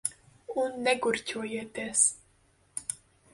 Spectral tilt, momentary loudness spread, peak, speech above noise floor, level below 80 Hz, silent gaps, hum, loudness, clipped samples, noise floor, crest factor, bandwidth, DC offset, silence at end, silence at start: -1 dB/octave; 15 LU; -10 dBFS; 36 dB; -68 dBFS; none; none; -29 LUFS; under 0.1%; -65 dBFS; 22 dB; 11.5 kHz; under 0.1%; 0.4 s; 0.05 s